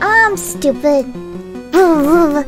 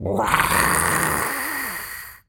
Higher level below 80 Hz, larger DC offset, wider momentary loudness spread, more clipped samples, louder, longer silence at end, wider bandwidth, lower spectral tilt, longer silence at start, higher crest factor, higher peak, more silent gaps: about the same, -40 dBFS vs -42 dBFS; neither; first, 18 LU vs 11 LU; neither; first, -13 LUFS vs -20 LUFS; about the same, 0 s vs 0.1 s; second, 16.5 kHz vs over 20 kHz; first, -4.5 dB/octave vs -2.5 dB/octave; about the same, 0 s vs 0 s; second, 12 dB vs 22 dB; about the same, 0 dBFS vs 0 dBFS; neither